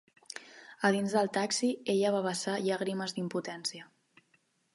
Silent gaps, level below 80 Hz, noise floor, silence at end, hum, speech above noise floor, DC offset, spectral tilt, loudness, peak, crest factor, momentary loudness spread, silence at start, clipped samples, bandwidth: none; -82 dBFS; -72 dBFS; 0.9 s; none; 41 dB; under 0.1%; -4 dB/octave; -31 LUFS; -12 dBFS; 22 dB; 17 LU; 0.35 s; under 0.1%; 11.5 kHz